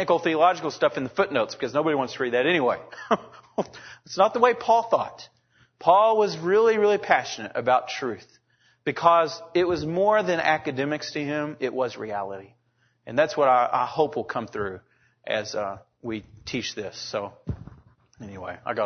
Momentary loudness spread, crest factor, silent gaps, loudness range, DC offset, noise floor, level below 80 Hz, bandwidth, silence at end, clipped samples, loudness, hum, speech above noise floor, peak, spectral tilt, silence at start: 15 LU; 22 dB; none; 9 LU; under 0.1%; -68 dBFS; -58 dBFS; 6.6 kHz; 0 s; under 0.1%; -24 LUFS; none; 44 dB; -2 dBFS; -5 dB/octave; 0 s